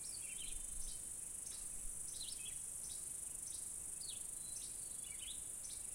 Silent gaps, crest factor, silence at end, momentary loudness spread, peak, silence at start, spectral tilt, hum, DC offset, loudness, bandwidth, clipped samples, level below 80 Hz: none; 16 dB; 0 s; 1 LU; -32 dBFS; 0 s; 0 dB/octave; none; under 0.1%; -45 LUFS; 16.5 kHz; under 0.1%; -60 dBFS